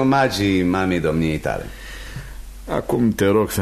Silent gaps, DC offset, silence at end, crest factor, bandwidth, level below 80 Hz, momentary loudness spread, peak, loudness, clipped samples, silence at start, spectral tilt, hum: none; under 0.1%; 0 s; 16 dB; 13.5 kHz; -38 dBFS; 18 LU; -4 dBFS; -20 LUFS; under 0.1%; 0 s; -6 dB/octave; none